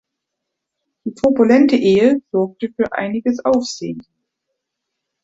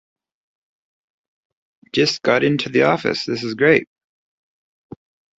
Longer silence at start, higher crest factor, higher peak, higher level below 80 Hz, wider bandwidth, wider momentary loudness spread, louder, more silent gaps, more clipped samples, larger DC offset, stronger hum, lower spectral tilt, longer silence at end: second, 1.05 s vs 1.95 s; about the same, 16 dB vs 20 dB; about the same, -2 dBFS vs -2 dBFS; about the same, -56 dBFS vs -60 dBFS; about the same, 7.8 kHz vs 8 kHz; first, 16 LU vs 7 LU; about the same, -16 LUFS vs -18 LUFS; neither; neither; neither; neither; about the same, -6 dB/octave vs -5 dB/octave; second, 1.2 s vs 1.55 s